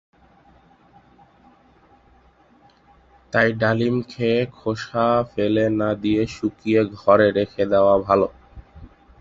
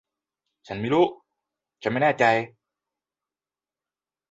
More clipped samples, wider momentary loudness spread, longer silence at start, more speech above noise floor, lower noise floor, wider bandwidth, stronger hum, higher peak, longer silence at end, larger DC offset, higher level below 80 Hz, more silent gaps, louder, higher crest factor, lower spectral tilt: neither; second, 9 LU vs 14 LU; first, 3.35 s vs 0.7 s; second, 35 dB vs over 68 dB; second, -55 dBFS vs under -90 dBFS; about the same, 7.6 kHz vs 8 kHz; neither; first, -2 dBFS vs -6 dBFS; second, 0.35 s vs 1.85 s; neither; first, -50 dBFS vs -66 dBFS; neither; first, -20 LUFS vs -23 LUFS; about the same, 20 dB vs 20 dB; about the same, -7 dB/octave vs -6.5 dB/octave